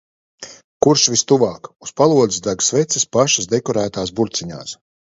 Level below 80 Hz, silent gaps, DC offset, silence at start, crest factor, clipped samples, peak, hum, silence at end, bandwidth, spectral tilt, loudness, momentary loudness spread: -54 dBFS; 0.64-0.80 s; under 0.1%; 0.4 s; 18 dB; under 0.1%; 0 dBFS; none; 0.4 s; 7.8 kHz; -3.5 dB/octave; -16 LUFS; 20 LU